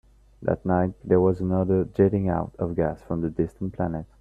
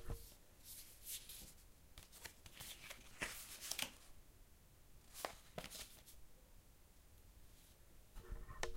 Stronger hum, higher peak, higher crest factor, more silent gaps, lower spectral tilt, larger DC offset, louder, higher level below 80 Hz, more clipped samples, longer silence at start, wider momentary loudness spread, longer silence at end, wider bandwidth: neither; first, -6 dBFS vs -20 dBFS; second, 18 dB vs 32 dB; neither; first, -11.5 dB/octave vs -2 dB/octave; neither; first, -25 LUFS vs -52 LUFS; first, -48 dBFS vs -60 dBFS; neither; first, 0.4 s vs 0 s; second, 8 LU vs 20 LU; first, 0.15 s vs 0 s; second, 3.6 kHz vs 16 kHz